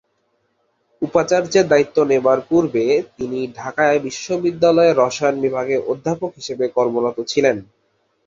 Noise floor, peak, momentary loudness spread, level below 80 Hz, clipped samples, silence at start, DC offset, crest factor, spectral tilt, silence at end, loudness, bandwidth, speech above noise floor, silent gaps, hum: -66 dBFS; -2 dBFS; 10 LU; -58 dBFS; under 0.1%; 1 s; under 0.1%; 16 dB; -5 dB/octave; 0.65 s; -18 LUFS; 7.8 kHz; 49 dB; none; none